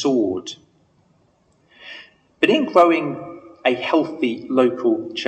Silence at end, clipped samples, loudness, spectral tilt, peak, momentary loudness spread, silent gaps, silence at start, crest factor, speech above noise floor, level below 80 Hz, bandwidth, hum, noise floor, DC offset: 0 s; under 0.1%; -19 LUFS; -5 dB/octave; -2 dBFS; 23 LU; none; 0 s; 20 dB; 42 dB; -68 dBFS; 8.6 kHz; none; -60 dBFS; under 0.1%